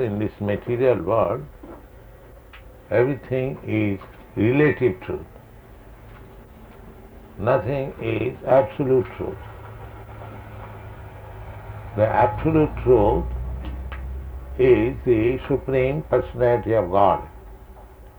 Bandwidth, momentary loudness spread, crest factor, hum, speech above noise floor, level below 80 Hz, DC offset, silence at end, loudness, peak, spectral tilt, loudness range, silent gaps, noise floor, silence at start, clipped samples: over 20 kHz; 21 LU; 18 dB; none; 24 dB; -38 dBFS; under 0.1%; 0.1 s; -22 LUFS; -4 dBFS; -9.5 dB/octave; 7 LU; none; -45 dBFS; 0 s; under 0.1%